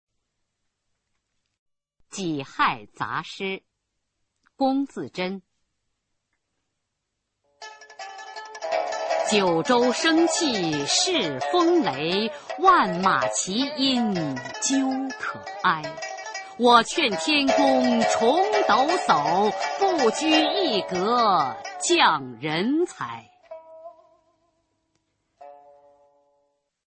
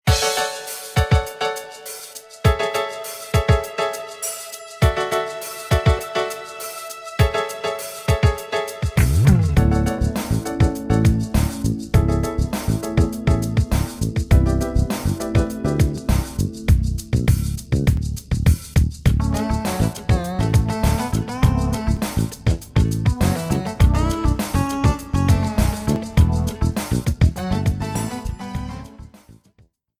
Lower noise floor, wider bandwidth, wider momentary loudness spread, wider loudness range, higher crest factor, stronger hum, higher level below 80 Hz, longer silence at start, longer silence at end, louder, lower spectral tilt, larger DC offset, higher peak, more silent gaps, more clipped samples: first, -80 dBFS vs -57 dBFS; second, 8.8 kHz vs 16.5 kHz; first, 15 LU vs 9 LU; first, 11 LU vs 3 LU; about the same, 22 dB vs 18 dB; neither; second, -66 dBFS vs -26 dBFS; first, 2.15 s vs 0.05 s; first, 1.3 s vs 0.7 s; about the same, -22 LUFS vs -21 LUFS; second, -3 dB/octave vs -6 dB/octave; neither; about the same, -4 dBFS vs -2 dBFS; neither; neither